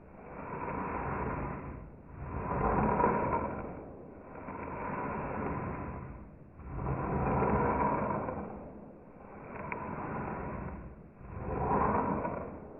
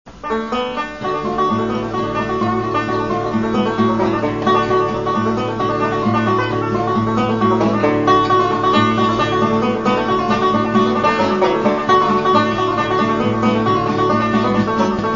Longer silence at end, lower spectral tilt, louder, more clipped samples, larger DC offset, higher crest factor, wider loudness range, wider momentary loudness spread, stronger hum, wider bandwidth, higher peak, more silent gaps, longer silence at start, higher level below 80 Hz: about the same, 0 s vs 0 s; second, -4 dB/octave vs -6.5 dB/octave; second, -35 LUFS vs -16 LUFS; neither; second, under 0.1% vs 0.4%; first, 22 dB vs 16 dB; first, 6 LU vs 3 LU; first, 19 LU vs 6 LU; neither; second, 2.9 kHz vs 7.4 kHz; second, -14 dBFS vs -2 dBFS; neither; about the same, 0 s vs 0.05 s; about the same, -46 dBFS vs -42 dBFS